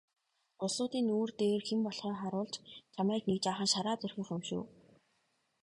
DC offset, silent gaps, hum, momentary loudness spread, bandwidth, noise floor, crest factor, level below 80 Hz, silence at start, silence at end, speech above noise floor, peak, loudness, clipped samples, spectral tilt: under 0.1%; none; none; 10 LU; 11.5 kHz; -78 dBFS; 18 dB; -74 dBFS; 0.6 s; 0.95 s; 43 dB; -18 dBFS; -35 LUFS; under 0.1%; -4.5 dB/octave